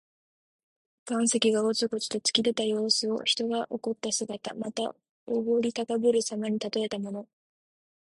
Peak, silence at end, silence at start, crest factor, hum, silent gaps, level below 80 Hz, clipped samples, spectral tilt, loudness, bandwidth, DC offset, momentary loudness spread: -8 dBFS; 0.75 s; 1.05 s; 20 dB; none; 5.09-5.26 s; -74 dBFS; under 0.1%; -3 dB/octave; -28 LUFS; 11.5 kHz; under 0.1%; 10 LU